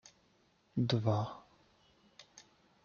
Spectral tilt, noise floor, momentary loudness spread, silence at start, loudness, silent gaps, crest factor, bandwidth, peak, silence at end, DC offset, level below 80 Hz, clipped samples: -7 dB/octave; -71 dBFS; 24 LU; 0.75 s; -35 LUFS; none; 22 dB; 7.2 kHz; -18 dBFS; 0.45 s; under 0.1%; -72 dBFS; under 0.1%